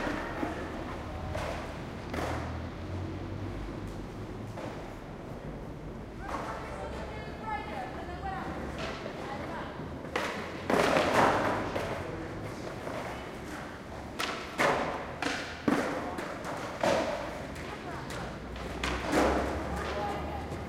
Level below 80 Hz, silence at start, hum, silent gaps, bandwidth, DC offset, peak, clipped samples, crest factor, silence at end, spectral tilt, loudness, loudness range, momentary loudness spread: -46 dBFS; 0 s; none; none; 16 kHz; under 0.1%; -8 dBFS; under 0.1%; 26 dB; 0 s; -5 dB/octave; -34 LUFS; 10 LU; 13 LU